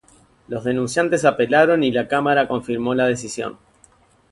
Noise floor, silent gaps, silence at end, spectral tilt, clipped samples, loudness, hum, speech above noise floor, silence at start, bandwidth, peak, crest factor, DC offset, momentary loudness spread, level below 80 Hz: -55 dBFS; none; 0.8 s; -5 dB/octave; under 0.1%; -19 LUFS; none; 36 dB; 0.5 s; 11.5 kHz; -2 dBFS; 18 dB; under 0.1%; 12 LU; -56 dBFS